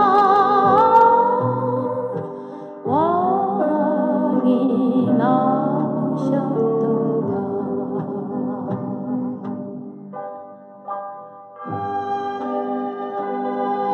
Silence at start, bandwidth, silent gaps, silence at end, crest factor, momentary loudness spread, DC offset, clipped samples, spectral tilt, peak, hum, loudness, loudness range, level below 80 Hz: 0 s; 6.4 kHz; none; 0 s; 18 dB; 18 LU; under 0.1%; under 0.1%; -9 dB/octave; -2 dBFS; none; -20 LUFS; 11 LU; -76 dBFS